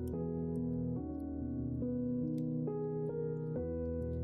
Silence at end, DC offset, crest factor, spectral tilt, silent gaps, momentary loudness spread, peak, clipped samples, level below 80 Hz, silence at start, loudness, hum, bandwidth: 0 s; under 0.1%; 10 dB; -12 dB/octave; none; 3 LU; -28 dBFS; under 0.1%; -52 dBFS; 0 s; -38 LUFS; none; 2.2 kHz